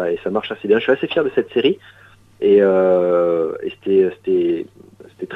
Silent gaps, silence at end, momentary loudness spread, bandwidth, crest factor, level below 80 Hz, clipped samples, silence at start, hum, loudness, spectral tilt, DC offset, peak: none; 0 s; 11 LU; 4.1 kHz; 16 dB; -60 dBFS; under 0.1%; 0 s; none; -17 LUFS; -7.5 dB/octave; under 0.1%; -2 dBFS